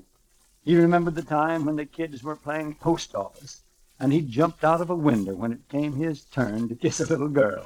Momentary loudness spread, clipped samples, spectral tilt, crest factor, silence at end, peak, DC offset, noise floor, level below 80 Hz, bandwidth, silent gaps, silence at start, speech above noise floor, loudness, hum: 12 LU; under 0.1%; -6.5 dB/octave; 18 dB; 0 s; -8 dBFS; under 0.1%; -62 dBFS; -54 dBFS; 15 kHz; none; 0.65 s; 38 dB; -25 LUFS; none